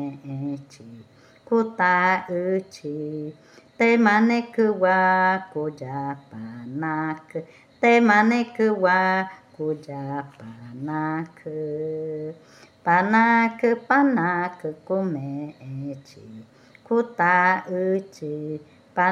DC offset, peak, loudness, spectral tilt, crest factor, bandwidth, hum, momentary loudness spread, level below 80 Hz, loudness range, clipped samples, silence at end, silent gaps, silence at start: under 0.1%; -4 dBFS; -22 LUFS; -7 dB/octave; 20 dB; 9.4 kHz; none; 17 LU; -74 dBFS; 5 LU; under 0.1%; 0 s; none; 0 s